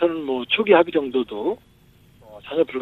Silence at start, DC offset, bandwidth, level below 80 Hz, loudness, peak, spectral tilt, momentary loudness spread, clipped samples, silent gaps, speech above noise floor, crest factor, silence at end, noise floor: 0 s; under 0.1%; 4.2 kHz; -60 dBFS; -21 LUFS; -2 dBFS; -6.5 dB/octave; 13 LU; under 0.1%; none; 33 dB; 20 dB; 0 s; -53 dBFS